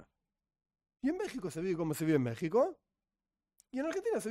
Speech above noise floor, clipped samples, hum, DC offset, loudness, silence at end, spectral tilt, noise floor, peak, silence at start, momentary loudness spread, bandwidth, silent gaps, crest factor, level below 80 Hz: over 57 dB; under 0.1%; none; under 0.1%; -35 LUFS; 0 s; -6.5 dB/octave; under -90 dBFS; -18 dBFS; 0 s; 7 LU; 16 kHz; none; 18 dB; -70 dBFS